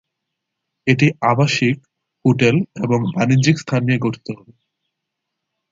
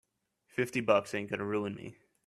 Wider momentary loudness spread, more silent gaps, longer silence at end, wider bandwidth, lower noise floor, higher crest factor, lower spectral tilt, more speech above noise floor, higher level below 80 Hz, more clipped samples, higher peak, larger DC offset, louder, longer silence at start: second, 10 LU vs 14 LU; neither; first, 1.35 s vs 0.35 s; second, 7.8 kHz vs 14 kHz; first, -79 dBFS vs -73 dBFS; about the same, 18 dB vs 22 dB; about the same, -6 dB/octave vs -5.5 dB/octave; first, 62 dB vs 41 dB; first, -56 dBFS vs -72 dBFS; neither; first, -2 dBFS vs -12 dBFS; neither; first, -17 LUFS vs -33 LUFS; first, 0.85 s vs 0.55 s